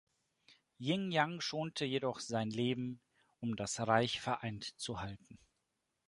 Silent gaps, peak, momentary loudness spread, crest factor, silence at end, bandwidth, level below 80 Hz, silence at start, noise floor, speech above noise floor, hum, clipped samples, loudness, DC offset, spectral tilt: none; -14 dBFS; 12 LU; 24 dB; 0.7 s; 11.5 kHz; -68 dBFS; 0.5 s; -85 dBFS; 47 dB; none; under 0.1%; -37 LUFS; under 0.1%; -4.5 dB/octave